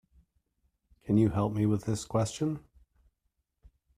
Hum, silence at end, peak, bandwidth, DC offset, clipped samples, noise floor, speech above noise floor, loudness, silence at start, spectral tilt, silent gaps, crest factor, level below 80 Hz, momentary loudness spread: none; 1.4 s; -14 dBFS; 14 kHz; under 0.1%; under 0.1%; -80 dBFS; 52 dB; -30 LUFS; 1.05 s; -7 dB/octave; none; 18 dB; -56 dBFS; 9 LU